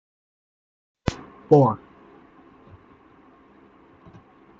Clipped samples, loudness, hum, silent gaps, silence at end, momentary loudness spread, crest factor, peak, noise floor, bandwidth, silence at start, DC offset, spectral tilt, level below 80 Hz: under 0.1%; -21 LUFS; none; none; 2.85 s; 18 LU; 24 dB; -2 dBFS; -53 dBFS; 7.6 kHz; 1.05 s; under 0.1%; -8.5 dB/octave; -52 dBFS